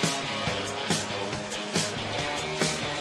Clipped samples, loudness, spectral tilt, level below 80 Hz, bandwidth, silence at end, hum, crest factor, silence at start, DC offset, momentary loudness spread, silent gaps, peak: under 0.1%; -29 LUFS; -3 dB/octave; -54 dBFS; 13 kHz; 0 s; none; 22 dB; 0 s; under 0.1%; 4 LU; none; -8 dBFS